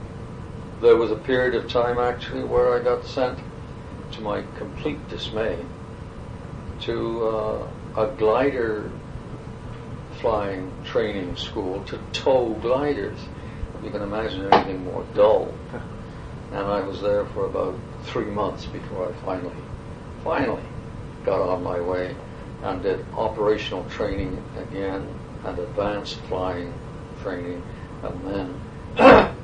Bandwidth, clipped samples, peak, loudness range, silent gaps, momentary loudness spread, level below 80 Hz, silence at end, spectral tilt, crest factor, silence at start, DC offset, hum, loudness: 9.8 kHz; under 0.1%; 0 dBFS; 7 LU; none; 17 LU; -42 dBFS; 0 s; -6.5 dB/octave; 24 dB; 0 s; under 0.1%; none; -24 LUFS